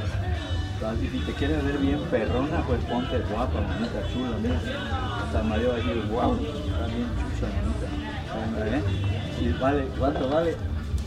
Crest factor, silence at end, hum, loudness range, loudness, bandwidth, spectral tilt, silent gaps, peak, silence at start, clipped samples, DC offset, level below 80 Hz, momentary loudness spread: 16 dB; 0 s; none; 2 LU; -27 LUFS; 11 kHz; -7 dB/octave; none; -10 dBFS; 0 s; under 0.1%; under 0.1%; -34 dBFS; 5 LU